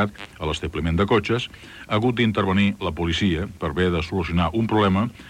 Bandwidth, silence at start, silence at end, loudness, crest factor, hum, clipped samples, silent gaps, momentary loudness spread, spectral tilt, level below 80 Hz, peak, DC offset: 12 kHz; 0 s; 0 s; -22 LUFS; 16 dB; none; under 0.1%; none; 7 LU; -6.5 dB/octave; -42 dBFS; -6 dBFS; under 0.1%